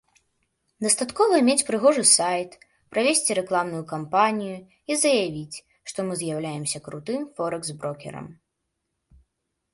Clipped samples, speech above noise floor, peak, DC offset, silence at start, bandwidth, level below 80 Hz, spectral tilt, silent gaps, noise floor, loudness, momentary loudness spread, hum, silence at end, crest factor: under 0.1%; 55 dB; -2 dBFS; under 0.1%; 0.8 s; 12 kHz; -66 dBFS; -3 dB/octave; none; -79 dBFS; -23 LUFS; 17 LU; none; 1.4 s; 22 dB